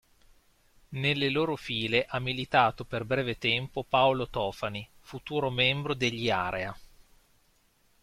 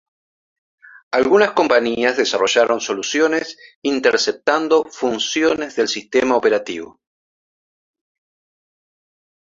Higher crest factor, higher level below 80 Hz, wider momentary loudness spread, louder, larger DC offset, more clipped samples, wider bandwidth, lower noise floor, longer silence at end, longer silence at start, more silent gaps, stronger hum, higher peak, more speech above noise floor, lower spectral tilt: about the same, 22 dB vs 18 dB; about the same, -56 dBFS vs -60 dBFS; first, 11 LU vs 8 LU; second, -28 LUFS vs -17 LUFS; neither; neither; first, 14.5 kHz vs 7.8 kHz; second, -67 dBFS vs under -90 dBFS; second, 1.15 s vs 2.65 s; second, 0.9 s vs 1.1 s; second, none vs 3.76-3.82 s; neither; second, -8 dBFS vs 0 dBFS; second, 38 dB vs over 73 dB; first, -5.5 dB/octave vs -2.5 dB/octave